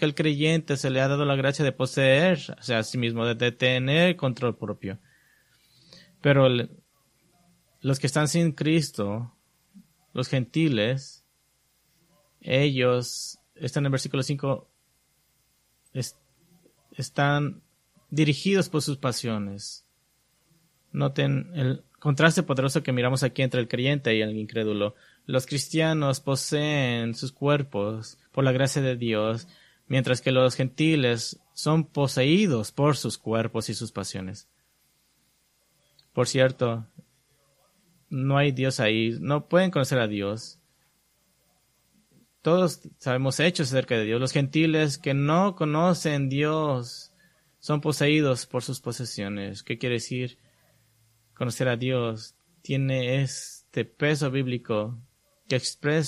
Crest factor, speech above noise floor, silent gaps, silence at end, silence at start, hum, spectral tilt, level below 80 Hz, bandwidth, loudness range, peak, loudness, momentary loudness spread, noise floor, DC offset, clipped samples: 22 dB; 44 dB; none; 0 s; 0 s; none; -5.5 dB/octave; -64 dBFS; 14 kHz; 6 LU; -4 dBFS; -25 LUFS; 12 LU; -68 dBFS; under 0.1%; under 0.1%